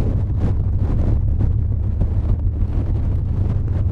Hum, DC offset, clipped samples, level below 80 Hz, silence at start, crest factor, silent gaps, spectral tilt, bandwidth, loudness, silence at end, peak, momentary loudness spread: none; under 0.1%; under 0.1%; -22 dBFS; 0 s; 12 dB; none; -11 dB/octave; 3.5 kHz; -21 LUFS; 0 s; -6 dBFS; 2 LU